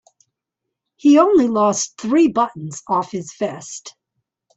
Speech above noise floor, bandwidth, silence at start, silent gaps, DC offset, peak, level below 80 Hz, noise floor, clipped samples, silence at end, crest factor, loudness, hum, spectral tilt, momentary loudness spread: 64 dB; 8.2 kHz; 1.05 s; none; under 0.1%; -4 dBFS; -62 dBFS; -81 dBFS; under 0.1%; 0.65 s; 16 dB; -17 LUFS; none; -5 dB/octave; 19 LU